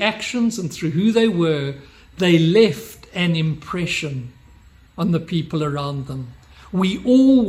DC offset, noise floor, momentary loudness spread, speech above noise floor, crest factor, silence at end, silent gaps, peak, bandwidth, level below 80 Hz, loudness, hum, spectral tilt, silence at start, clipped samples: under 0.1%; -48 dBFS; 17 LU; 30 dB; 18 dB; 0 s; none; -2 dBFS; 15.5 kHz; -50 dBFS; -19 LUFS; none; -6 dB/octave; 0 s; under 0.1%